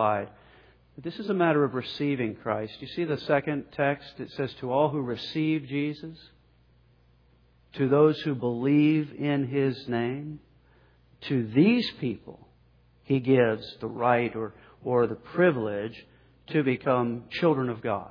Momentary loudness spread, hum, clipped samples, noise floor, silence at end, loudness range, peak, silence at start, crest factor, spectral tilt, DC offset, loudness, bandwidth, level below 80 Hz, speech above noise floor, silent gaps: 14 LU; none; under 0.1%; -61 dBFS; 0 s; 4 LU; -8 dBFS; 0 s; 20 dB; -9 dB/octave; under 0.1%; -27 LUFS; 5.4 kHz; -64 dBFS; 35 dB; none